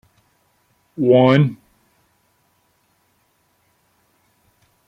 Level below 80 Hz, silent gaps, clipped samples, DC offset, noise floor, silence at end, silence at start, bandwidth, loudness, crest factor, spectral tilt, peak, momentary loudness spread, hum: -64 dBFS; none; under 0.1%; under 0.1%; -64 dBFS; 3.35 s; 1 s; 6.4 kHz; -15 LUFS; 22 dB; -9 dB/octave; -2 dBFS; 27 LU; none